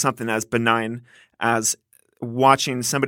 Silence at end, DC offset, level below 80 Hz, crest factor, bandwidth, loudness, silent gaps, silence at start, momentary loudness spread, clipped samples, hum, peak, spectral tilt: 0 s; under 0.1%; -64 dBFS; 22 dB; 18 kHz; -21 LUFS; none; 0 s; 14 LU; under 0.1%; none; 0 dBFS; -3.5 dB/octave